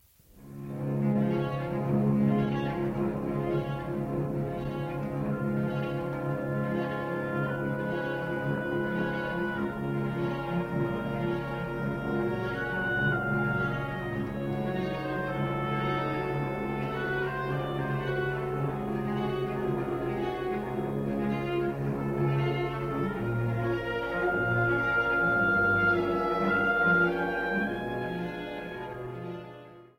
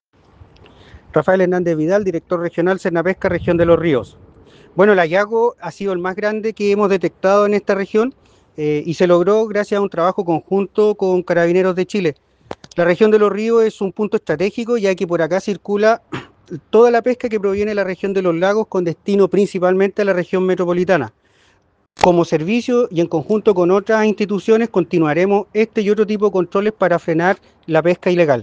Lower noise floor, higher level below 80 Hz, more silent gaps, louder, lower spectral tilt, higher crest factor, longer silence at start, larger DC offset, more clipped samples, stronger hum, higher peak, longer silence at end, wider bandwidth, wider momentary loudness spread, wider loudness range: second, -53 dBFS vs -58 dBFS; about the same, -50 dBFS vs -52 dBFS; neither; second, -30 LUFS vs -16 LUFS; about the same, -8 dB/octave vs -7 dB/octave; about the same, 16 dB vs 16 dB; second, 0.35 s vs 0.95 s; neither; neither; neither; second, -14 dBFS vs 0 dBFS; first, 0.15 s vs 0 s; first, 15.5 kHz vs 8.8 kHz; about the same, 8 LU vs 7 LU; first, 5 LU vs 2 LU